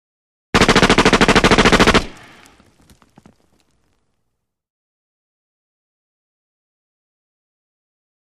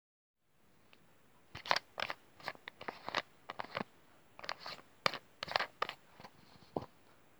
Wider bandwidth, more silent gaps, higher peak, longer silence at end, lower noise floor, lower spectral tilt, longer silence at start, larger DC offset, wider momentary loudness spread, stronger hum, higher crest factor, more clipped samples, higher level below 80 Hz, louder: second, 14 kHz vs over 20 kHz; neither; first, -2 dBFS vs -8 dBFS; first, 6.15 s vs 0.55 s; about the same, -74 dBFS vs -71 dBFS; about the same, -4 dB/octave vs -3 dB/octave; second, 0.55 s vs 1.55 s; neither; second, 7 LU vs 20 LU; neither; second, 18 dB vs 36 dB; neither; first, -32 dBFS vs -76 dBFS; first, -12 LUFS vs -41 LUFS